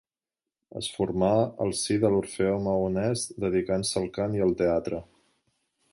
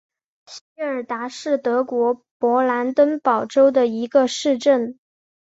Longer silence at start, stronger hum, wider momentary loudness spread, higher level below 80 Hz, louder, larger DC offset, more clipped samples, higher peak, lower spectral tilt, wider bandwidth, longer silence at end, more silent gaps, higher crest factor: first, 0.75 s vs 0.5 s; neither; second, 8 LU vs 12 LU; first, -52 dBFS vs -68 dBFS; second, -27 LUFS vs -20 LUFS; neither; neither; second, -10 dBFS vs -4 dBFS; first, -5.5 dB/octave vs -4 dB/octave; first, 11.5 kHz vs 8 kHz; first, 0.9 s vs 0.5 s; second, none vs 0.61-0.76 s, 2.31-2.40 s; about the same, 18 dB vs 16 dB